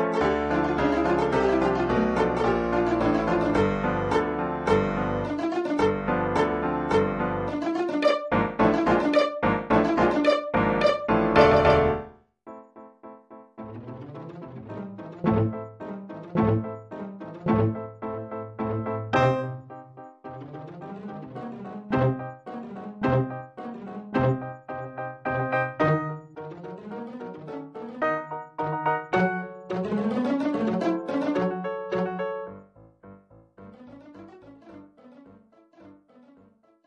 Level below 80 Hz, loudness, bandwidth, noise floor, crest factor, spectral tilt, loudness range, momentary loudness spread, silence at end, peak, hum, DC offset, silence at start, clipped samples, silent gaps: -48 dBFS; -25 LUFS; 10.5 kHz; -59 dBFS; 22 dB; -7.5 dB/octave; 10 LU; 17 LU; 0.95 s; -4 dBFS; none; under 0.1%; 0 s; under 0.1%; none